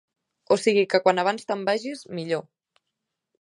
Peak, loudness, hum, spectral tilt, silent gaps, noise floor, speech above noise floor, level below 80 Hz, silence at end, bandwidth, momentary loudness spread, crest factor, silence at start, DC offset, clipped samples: -4 dBFS; -24 LUFS; none; -4.5 dB/octave; none; -83 dBFS; 59 dB; -76 dBFS; 1 s; 11 kHz; 10 LU; 22 dB; 0.5 s; under 0.1%; under 0.1%